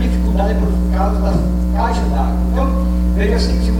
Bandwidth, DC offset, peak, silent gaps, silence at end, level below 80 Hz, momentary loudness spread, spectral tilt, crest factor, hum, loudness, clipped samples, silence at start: 11 kHz; under 0.1%; -4 dBFS; none; 0 s; -16 dBFS; 1 LU; -7.5 dB/octave; 10 dB; 60 Hz at -15 dBFS; -17 LUFS; under 0.1%; 0 s